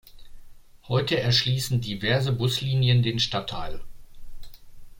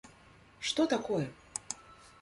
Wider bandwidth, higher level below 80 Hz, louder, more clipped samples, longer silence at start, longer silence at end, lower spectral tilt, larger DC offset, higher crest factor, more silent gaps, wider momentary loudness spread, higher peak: first, 16.5 kHz vs 11.5 kHz; first, -44 dBFS vs -68 dBFS; first, -24 LUFS vs -34 LUFS; neither; about the same, 0.05 s vs 0.05 s; second, 0 s vs 0.15 s; about the same, -5 dB/octave vs -4 dB/octave; neither; about the same, 18 dB vs 20 dB; neither; about the same, 12 LU vs 13 LU; first, -8 dBFS vs -16 dBFS